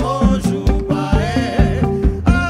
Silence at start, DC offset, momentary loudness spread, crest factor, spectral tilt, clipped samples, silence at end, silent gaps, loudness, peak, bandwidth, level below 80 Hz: 0 s; under 0.1%; 2 LU; 14 dB; -7 dB/octave; under 0.1%; 0 s; none; -17 LUFS; -2 dBFS; 12 kHz; -20 dBFS